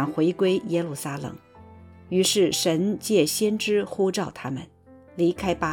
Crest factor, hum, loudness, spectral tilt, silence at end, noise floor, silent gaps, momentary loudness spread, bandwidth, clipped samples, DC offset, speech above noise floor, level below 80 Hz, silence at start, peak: 16 dB; none; -24 LUFS; -4.5 dB/octave; 0 s; -47 dBFS; none; 13 LU; 19 kHz; under 0.1%; under 0.1%; 24 dB; -56 dBFS; 0 s; -8 dBFS